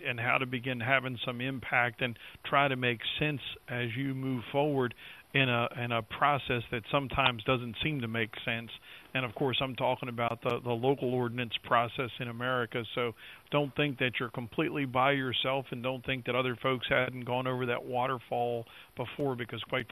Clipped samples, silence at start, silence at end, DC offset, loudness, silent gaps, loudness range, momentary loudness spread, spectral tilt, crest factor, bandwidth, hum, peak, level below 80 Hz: under 0.1%; 0 s; 0.05 s; under 0.1%; -32 LUFS; none; 2 LU; 8 LU; -6.5 dB/octave; 22 dB; 13.5 kHz; none; -10 dBFS; -62 dBFS